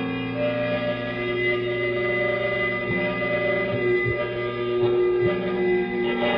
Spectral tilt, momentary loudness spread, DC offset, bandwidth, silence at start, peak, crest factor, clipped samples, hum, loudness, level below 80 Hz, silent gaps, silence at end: -8.5 dB/octave; 4 LU; under 0.1%; 5.2 kHz; 0 s; -10 dBFS; 12 dB; under 0.1%; 60 Hz at -40 dBFS; -24 LUFS; -50 dBFS; none; 0 s